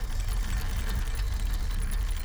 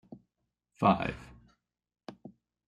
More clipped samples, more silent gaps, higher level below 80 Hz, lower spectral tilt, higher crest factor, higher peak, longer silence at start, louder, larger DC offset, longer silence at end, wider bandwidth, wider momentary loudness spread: neither; neither; first, -28 dBFS vs -60 dBFS; second, -4 dB/octave vs -8 dB/octave; second, 10 dB vs 24 dB; second, -18 dBFS vs -10 dBFS; about the same, 0 s vs 0.1 s; second, -33 LUFS vs -29 LUFS; neither; second, 0 s vs 0.4 s; first, over 20 kHz vs 10 kHz; second, 1 LU vs 24 LU